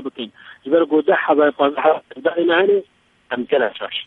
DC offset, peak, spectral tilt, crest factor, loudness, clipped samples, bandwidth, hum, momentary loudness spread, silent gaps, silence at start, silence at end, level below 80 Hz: under 0.1%; -2 dBFS; -7 dB/octave; 16 dB; -18 LUFS; under 0.1%; 4.1 kHz; none; 14 LU; none; 0 s; 0.05 s; -68 dBFS